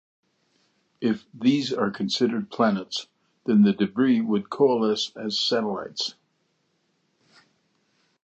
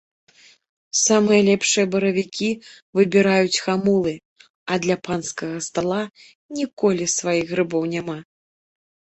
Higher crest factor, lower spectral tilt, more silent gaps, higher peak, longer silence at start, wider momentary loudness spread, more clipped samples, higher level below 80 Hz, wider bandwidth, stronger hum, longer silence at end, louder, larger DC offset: about the same, 18 dB vs 18 dB; first, -5.5 dB/octave vs -4 dB/octave; second, none vs 2.82-2.93 s, 4.25-4.36 s, 4.50-4.66 s, 6.35-6.49 s, 6.73-6.77 s; second, -8 dBFS vs -4 dBFS; about the same, 1 s vs 0.95 s; second, 9 LU vs 12 LU; neither; second, -70 dBFS vs -62 dBFS; about the same, 8.2 kHz vs 8.4 kHz; neither; first, 2.1 s vs 0.9 s; second, -24 LUFS vs -20 LUFS; neither